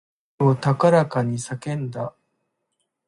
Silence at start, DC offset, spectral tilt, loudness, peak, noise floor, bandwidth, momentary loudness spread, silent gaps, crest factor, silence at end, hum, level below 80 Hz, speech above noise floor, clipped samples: 0.4 s; under 0.1%; -7 dB/octave; -21 LUFS; -4 dBFS; -76 dBFS; 11.5 kHz; 13 LU; none; 18 dB; 1 s; none; -62 dBFS; 55 dB; under 0.1%